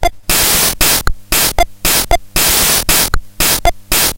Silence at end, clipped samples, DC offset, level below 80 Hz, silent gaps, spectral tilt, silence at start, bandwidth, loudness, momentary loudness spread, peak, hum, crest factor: 0 s; under 0.1%; under 0.1%; -22 dBFS; none; -1 dB/octave; 0 s; 17.5 kHz; -11 LUFS; 5 LU; 0 dBFS; none; 12 dB